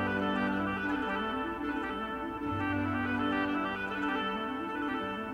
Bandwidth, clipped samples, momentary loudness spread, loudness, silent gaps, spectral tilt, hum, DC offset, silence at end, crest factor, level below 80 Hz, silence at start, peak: 15.5 kHz; under 0.1%; 5 LU; -33 LUFS; none; -6.5 dB/octave; none; under 0.1%; 0 s; 14 dB; -56 dBFS; 0 s; -20 dBFS